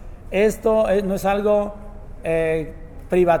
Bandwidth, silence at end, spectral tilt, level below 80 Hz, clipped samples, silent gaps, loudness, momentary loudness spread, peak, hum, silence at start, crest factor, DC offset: 19 kHz; 0 s; -6.5 dB/octave; -36 dBFS; under 0.1%; none; -20 LUFS; 17 LU; -6 dBFS; none; 0 s; 14 dB; under 0.1%